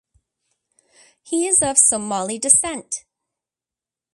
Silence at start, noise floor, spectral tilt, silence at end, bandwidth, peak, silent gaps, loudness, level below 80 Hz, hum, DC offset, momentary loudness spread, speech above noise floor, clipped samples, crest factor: 1.25 s; -90 dBFS; -2 dB/octave; 1.15 s; 12 kHz; 0 dBFS; none; -16 LUFS; -58 dBFS; none; under 0.1%; 15 LU; 71 dB; under 0.1%; 22 dB